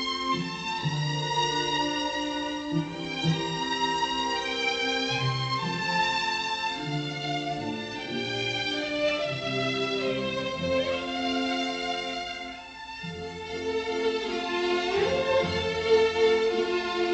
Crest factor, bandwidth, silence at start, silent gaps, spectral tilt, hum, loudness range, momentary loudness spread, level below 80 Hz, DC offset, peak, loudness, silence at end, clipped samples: 18 dB; 8.6 kHz; 0 s; none; -4.5 dB/octave; none; 5 LU; 7 LU; -56 dBFS; under 0.1%; -10 dBFS; -28 LUFS; 0 s; under 0.1%